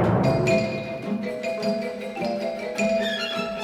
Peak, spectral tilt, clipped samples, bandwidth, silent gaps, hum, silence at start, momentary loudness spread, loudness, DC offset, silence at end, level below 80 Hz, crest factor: -8 dBFS; -6 dB/octave; under 0.1%; 15 kHz; none; none; 0 s; 8 LU; -25 LUFS; under 0.1%; 0 s; -52 dBFS; 16 dB